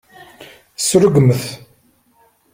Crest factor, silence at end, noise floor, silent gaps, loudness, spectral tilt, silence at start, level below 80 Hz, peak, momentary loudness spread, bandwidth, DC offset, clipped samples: 16 dB; 0.95 s; -56 dBFS; none; -14 LUFS; -5.5 dB/octave; 0.2 s; -50 dBFS; 0 dBFS; 22 LU; 16.5 kHz; under 0.1%; under 0.1%